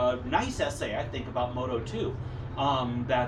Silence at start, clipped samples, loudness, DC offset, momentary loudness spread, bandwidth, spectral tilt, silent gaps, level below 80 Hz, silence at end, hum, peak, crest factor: 0 s; under 0.1%; -31 LUFS; under 0.1%; 6 LU; 12.5 kHz; -5.5 dB/octave; none; -46 dBFS; 0 s; none; -12 dBFS; 18 dB